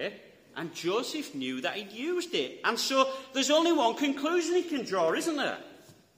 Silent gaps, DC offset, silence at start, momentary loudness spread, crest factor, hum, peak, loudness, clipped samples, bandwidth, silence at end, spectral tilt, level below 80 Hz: none; under 0.1%; 0 s; 10 LU; 20 dB; none; -10 dBFS; -29 LUFS; under 0.1%; 16 kHz; 0.25 s; -2.5 dB/octave; -80 dBFS